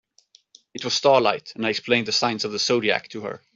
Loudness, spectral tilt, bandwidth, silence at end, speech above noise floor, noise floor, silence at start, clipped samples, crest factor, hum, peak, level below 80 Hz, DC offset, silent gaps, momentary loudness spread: -22 LUFS; -3 dB/octave; 8 kHz; 0.2 s; 36 dB; -59 dBFS; 0.75 s; under 0.1%; 20 dB; none; -4 dBFS; -68 dBFS; under 0.1%; none; 15 LU